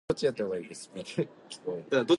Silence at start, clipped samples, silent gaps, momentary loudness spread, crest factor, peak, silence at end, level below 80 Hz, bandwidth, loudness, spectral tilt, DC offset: 0.1 s; under 0.1%; none; 11 LU; 20 dB; -12 dBFS; 0 s; -62 dBFS; 11.5 kHz; -34 LUFS; -5 dB/octave; under 0.1%